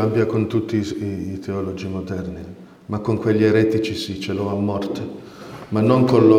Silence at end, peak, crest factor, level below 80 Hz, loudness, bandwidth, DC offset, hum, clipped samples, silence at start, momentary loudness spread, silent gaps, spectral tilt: 0 s; 0 dBFS; 20 dB; -52 dBFS; -21 LUFS; 13.5 kHz; under 0.1%; none; under 0.1%; 0 s; 17 LU; none; -7.5 dB/octave